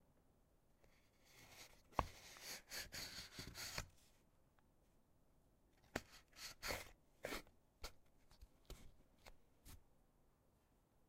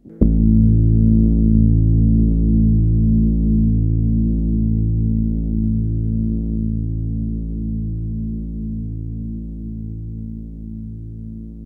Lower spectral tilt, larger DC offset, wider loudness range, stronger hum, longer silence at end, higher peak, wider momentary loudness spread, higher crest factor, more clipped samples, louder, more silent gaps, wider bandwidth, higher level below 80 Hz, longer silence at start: second, -2.5 dB/octave vs -15.5 dB/octave; neither; second, 7 LU vs 12 LU; neither; about the same, 0.05 s vs 0 s; second, -18 dBFS vs 0 dBFS; first, 20 LU vs 16 LU; first, 38 dB vs 16 dB; neither; second, -52 LUFS vs -18 LUFS; neither; first, 16 kHz vs 0.8 kHz; second, -66 dBFS vs -20 dBFS; about the same, 0 s vs 0.05 s